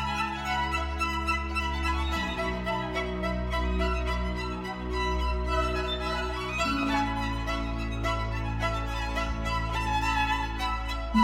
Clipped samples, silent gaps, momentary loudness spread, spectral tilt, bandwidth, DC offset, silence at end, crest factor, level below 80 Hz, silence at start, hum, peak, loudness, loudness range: under 0.1%; none; 4 LU; -5 dB/octave; 15.5 kHz; under 0.1%; 0 s; 18 dB; -34 dBFS; 0 s; none; -12 dBFS; -29 LUFS; 1 LU